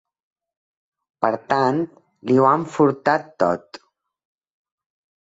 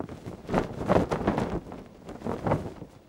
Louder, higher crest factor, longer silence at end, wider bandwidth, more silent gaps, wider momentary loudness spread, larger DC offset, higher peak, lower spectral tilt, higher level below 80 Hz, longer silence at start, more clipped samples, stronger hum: first, -20 LUFS vs -29 LUFS; about the same, 20 dB vs 24 dB; first, 1.45 s vs 0.1 s; second, 8 kHz vs 16.5 kHz; neither; second, 10 LU vs 17 LU; neither; first, -2 dBFS vs -6 dBFS; about the same, -7 dB/octave vs -7.5 dB/octave; second, -64 dBFS vs -46 dBFS; first, 1.2 s vs 0 s; neither; neither